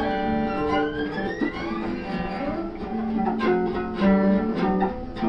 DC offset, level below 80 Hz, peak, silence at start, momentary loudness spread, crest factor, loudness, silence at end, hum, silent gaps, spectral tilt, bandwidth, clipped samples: under 0.1%; -42 dBFS; -10 dBFS; 0 s; 8 LU; 14 dB; -25 LUFS; 0 s; none; none; -8.5 dB/octave; 6 kHz; under 0.1%